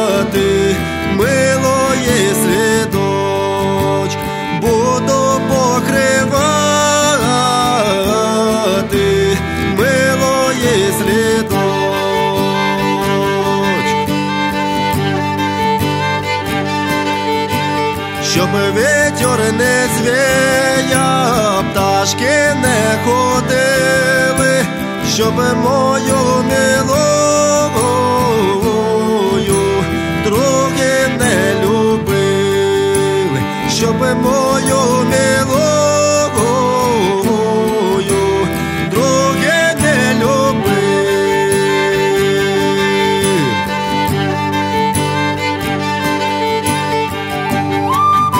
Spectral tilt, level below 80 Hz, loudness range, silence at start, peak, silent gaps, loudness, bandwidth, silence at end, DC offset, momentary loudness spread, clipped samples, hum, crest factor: -4.5 dB/octave; -38 dBFS; 3 LU; 0 s; 0 dBFS; none; -13 LUFS; 16.5 kHz; 0 s; under 0.1%; 4 LU; under 0.1%; none; 14 dB